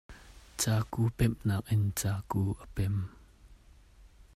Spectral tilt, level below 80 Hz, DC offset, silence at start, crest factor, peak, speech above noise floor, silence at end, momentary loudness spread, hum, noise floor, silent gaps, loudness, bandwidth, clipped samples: -5.5 dB/octave; -50 dBFS; under 0.1%; 0.1 s; 18 dB; -16 dBFS; 27 dB; 0.3 s; 6 LU; none; -57 dBFS; none; -32 LUFS; 16 kHz; under 0.1%